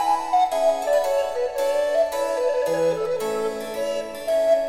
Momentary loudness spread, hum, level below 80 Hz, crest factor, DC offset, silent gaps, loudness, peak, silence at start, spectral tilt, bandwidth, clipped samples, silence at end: 7 LU; none; -56 dBFS; 12 dB; under 0.1%; none; -23 LUFS; -10 dBFS; 0 s; -3.5 dB/octave; 16.5 kHz; under 0.1%; 0 s